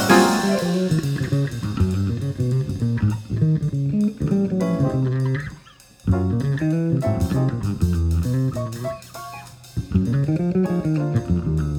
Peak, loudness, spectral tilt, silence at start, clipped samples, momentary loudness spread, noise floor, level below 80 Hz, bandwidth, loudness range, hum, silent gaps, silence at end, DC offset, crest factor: -2 dBFS; -22 LUFS; -7 dB/octave; 0 s; under 0.1%; 8 LU; -47 dBFS; -36 dBFS; 18.5 kHz; 2 LU; none; none; 0 s; under 0.1%; 20 dB